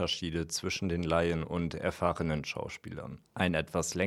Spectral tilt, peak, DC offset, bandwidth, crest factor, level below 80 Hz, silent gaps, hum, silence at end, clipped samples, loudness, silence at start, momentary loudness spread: -4.5 dB/octave; -12 dBFS; under 0.1%; 15 kHz; 22 dB; -50 dBFS; none; none; 0 s; under 0.1%; -33 LUFS; 0 s; 12 LU